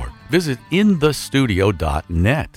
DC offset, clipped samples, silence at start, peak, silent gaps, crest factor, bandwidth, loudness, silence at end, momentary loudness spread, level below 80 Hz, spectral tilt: under 0.1%; under 0.1%; 0 s; -2 dBFS; none; 16 dB; 16.5 kHz; -18 LUFS; 0.1 s; 5 LU; -32 dBFS; -6 dB/octave